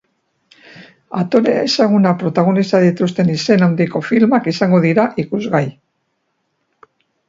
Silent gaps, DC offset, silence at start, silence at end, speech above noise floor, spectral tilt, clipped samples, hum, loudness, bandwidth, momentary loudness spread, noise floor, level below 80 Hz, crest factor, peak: none; under 0.1%; 0.75 s; 1.55 s; 54 dB; -7 dB/octave; under 0.1%; none; -15 LUFS; 7.6 kHz; 6 LU; -68 dBFS; -58 dBFS; 16 dB; 0 dBFS